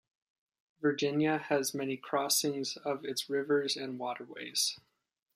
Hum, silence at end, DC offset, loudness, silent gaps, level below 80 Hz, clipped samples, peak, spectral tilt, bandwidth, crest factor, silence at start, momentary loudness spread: none; 0.55 s; under 0.1%; -33 LUFS; none; -82 dBFS; under 0.1%; -14 dBFS; -3 dB/octave; 15 kHz; 20 dB; 0.8 s; 9 LU